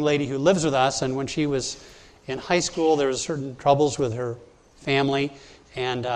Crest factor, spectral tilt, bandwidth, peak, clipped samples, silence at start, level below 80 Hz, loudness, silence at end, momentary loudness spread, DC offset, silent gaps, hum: 20 dB; -4.5 dB/octave; 10.5 kHz; -4 dBFS; under 0.1%; 0 s; -54 dBFS; -24 LUFS; 0 s; 13 LU; under 0.1%; none; none